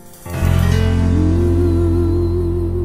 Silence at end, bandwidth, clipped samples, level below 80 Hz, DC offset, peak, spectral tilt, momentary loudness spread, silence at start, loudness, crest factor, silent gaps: 0 s; 15 kHz; under 0.1%; -22 dBFS; under 0.1%; -2 dBFS; -8 dB/octave; 4 LU; 0.05 s; -16 LUFS; 12 dB; none